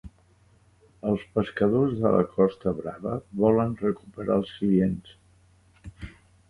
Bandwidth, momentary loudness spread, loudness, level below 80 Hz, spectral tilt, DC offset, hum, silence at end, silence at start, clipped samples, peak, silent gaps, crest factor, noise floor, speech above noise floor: 11 kHz; 13 LU; -26 LUFS; -52 dBFS; -9.5 dB/octave; under 0.1%; none; 0.4 s; 0.05 s; under 0.1%; -8 dBFS; none; 20 dB; -60 dBFS; 35 dB